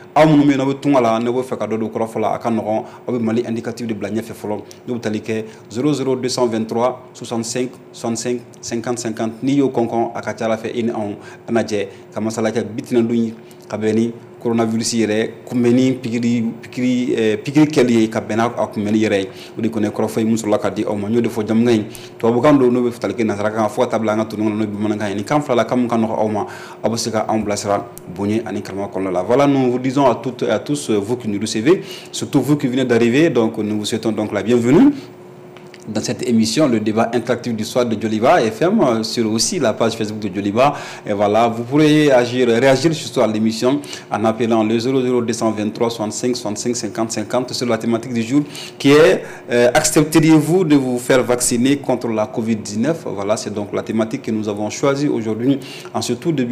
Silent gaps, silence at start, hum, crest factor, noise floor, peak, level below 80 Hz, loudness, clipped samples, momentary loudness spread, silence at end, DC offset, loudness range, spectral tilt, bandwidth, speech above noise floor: none; 0 s; none; 12 dB; -38 dBFS; -4 dBFS; -54 dBFS; -18 LUFS; under 0.1%; 11 LU; 0 s; under 0.1%; 6 LU; -5.5 dB/octave; 15.5 kHz; 21 dB